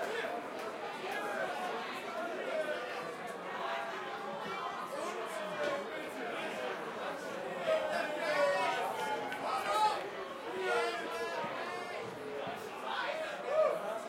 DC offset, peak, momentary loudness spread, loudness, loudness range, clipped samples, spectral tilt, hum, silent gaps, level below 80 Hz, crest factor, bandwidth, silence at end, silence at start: under 0.1%; -20 dBFS; 9 LU; -37 LUFS; 5 LU; under 0.1%; -3 dB/octave; none; none; -80 dBFS; 18 dB; 16.5 kHz; 0 s; 0 s